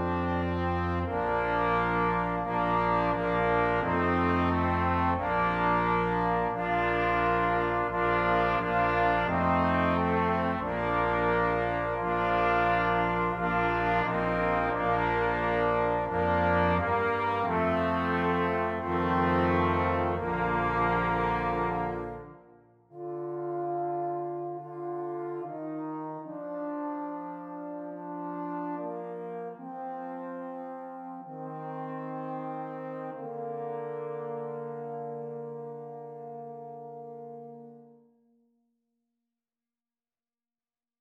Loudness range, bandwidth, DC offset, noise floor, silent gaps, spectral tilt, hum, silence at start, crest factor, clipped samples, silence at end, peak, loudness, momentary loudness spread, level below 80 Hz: 12 LU; 7.2 kHz; under 0.1%; under -90 dBFS; none; -8 dB/octave; none; 0 s; 16 dB; under 0.1%; 3.15 s; -14 dBFS; -29 LUFS; 14 LU; -48 dBFS